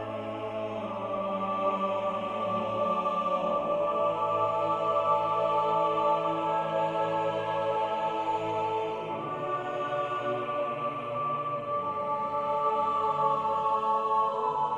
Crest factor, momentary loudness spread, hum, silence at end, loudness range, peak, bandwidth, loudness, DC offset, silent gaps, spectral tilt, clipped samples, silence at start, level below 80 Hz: 14 dB; 6 LU; none; 0 s; 4 LU; -14 dBFS; 8.8 kHz; -29 LUFS; under 0.1%; none; -6.5 dB/octave; under 0.1%; 0 s; -68 dBFS